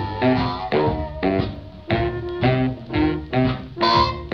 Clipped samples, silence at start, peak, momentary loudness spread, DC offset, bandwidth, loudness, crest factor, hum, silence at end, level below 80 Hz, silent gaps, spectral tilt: under 0.1%; 0 s; -4 dBFS; 6 LU; 0.2%; 6.6 kHz; -21 LUFS; 18 dB; none; 0 s; -36 dBFS; none; -7.5 dB/octave